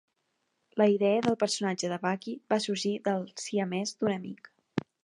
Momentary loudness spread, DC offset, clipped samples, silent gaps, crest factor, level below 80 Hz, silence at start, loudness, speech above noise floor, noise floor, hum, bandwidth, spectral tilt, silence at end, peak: 12 LU; under 0.1%; under 0.1%; none; 20 dB; -72 dBFS; 0.75 s; -30 LUFS; 49 dB; -78 dBFS; none; 11 kHz; -4.5 dB/octave; 0.25 s; -12 dBFS